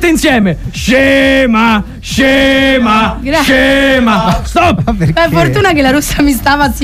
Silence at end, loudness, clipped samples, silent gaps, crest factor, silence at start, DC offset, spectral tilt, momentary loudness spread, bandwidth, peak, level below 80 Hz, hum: 0 s; -9 LUFS; under 0.1%; none; 8 dB; 0 s; under 0.1%; -5 dB/octave; 5 LU; 16 kHz; 0 dBFS; -24 dBFS; none